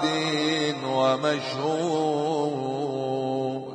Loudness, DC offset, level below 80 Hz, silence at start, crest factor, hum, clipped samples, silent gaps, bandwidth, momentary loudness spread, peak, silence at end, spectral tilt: -26 LUFS; under 0.1%; -74 dBFS; 0 s; 16 dB; none; under 0.1%; none; 10 kHz; 5 LU; -10 dBFS; 0 s; -5 dB/octave